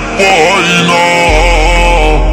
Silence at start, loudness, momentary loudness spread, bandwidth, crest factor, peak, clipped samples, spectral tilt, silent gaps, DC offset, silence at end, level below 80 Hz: 0 s; -7 LUFS; 2 LU; 13 kHz; 8 dB; 0 dBFS; 3%; -4 dB/octave; none; under 0.1%; 0 s; -14 dBFS